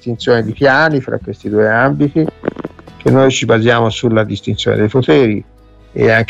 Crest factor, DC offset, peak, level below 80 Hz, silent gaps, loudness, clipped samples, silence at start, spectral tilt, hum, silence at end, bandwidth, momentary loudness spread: 12 dB; under 0.1%; 0 dBFS; -42 dBFS; none; -13 LUFS; under 0.1%; 0.05 s; -6 dB/octave; none; 0.05 s; 8.2 kHz; 12 LU